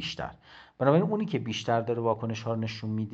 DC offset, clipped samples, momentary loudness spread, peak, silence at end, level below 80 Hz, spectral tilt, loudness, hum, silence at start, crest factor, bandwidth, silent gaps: under 0.1%; under 0.1%; 10 LU; -8 dBFS; 0 s; -62 dBFS; -6.5 dB/octave; -29 LUFS; none; 0 s; 22 dB; 8 kHz; none